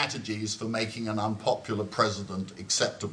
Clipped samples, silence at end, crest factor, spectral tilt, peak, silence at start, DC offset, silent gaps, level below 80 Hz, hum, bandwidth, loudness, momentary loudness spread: under 0.1%; 0 s; 24 dB; -3.5 dB/octave; -6 dBFS; 0 s; under 0.1%; none; -66 dBFS; none; 10.5 kHz; -30 LUFS; 6 LU